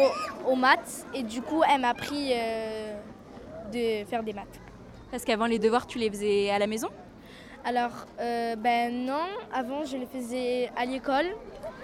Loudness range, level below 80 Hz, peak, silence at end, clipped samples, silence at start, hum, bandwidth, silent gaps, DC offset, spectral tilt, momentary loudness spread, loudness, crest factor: 4 LU; -58 dBFS; -6 dBFS; 0 s; under 0.1%; 0 s; none; 16 kHz; none; under 0.1%; -4 dB/octave; 18 LU; -28 LUFS; 22 dB